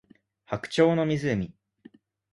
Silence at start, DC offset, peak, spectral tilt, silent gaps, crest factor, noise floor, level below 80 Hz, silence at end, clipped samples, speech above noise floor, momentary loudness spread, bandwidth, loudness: 0.5 s; under 0.1%; -8 dBFS; -6.5 dB/octave; none; 20 dB; -55 dBFS; -58 dBFS; 0.8 s; under 0.1%; 31 dB; 13 LU; 11.5 kHz; -26 LUFS